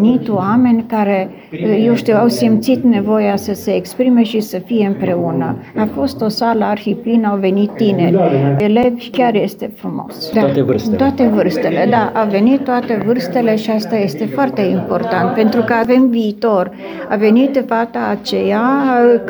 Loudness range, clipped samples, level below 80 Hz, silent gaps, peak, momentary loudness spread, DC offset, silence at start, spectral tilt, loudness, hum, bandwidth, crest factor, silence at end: 2 LU; under 0.1%; -52 dBFS; none; -2 dBFS; 7 LU; under 0.1%; 0 s; -7 dB/octave; -14 LUFS; none; over 20 kHz; 12 dB; 0 s